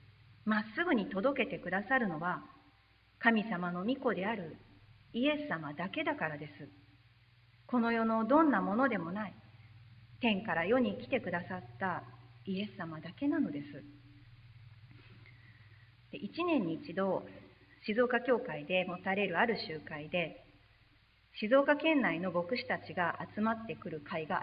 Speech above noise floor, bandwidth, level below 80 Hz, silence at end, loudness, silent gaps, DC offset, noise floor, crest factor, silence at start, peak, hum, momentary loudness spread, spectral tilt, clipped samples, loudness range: 33 dB; 5.2 kHz; -70 dBFS; 0 s; -34 LUFS; none; under 0.1%; -67 dBFS; 24 dB; 0.45 s; -12 dBFS; none; 14 LU; -9 dB/octave; under 0.1%; 7 LU